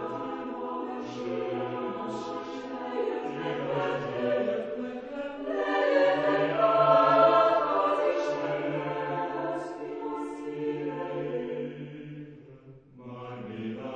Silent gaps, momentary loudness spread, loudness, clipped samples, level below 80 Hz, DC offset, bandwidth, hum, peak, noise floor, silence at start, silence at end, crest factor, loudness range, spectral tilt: none; 16 LU; -28 LUFS; under 0.1%; -68 dBFS; under 0.1%; 8.6 kHz; none; -8 dBFS; -51 dBFS; 0 s; 0 s; 22 dB; 12 LU; -6.5 dB/octave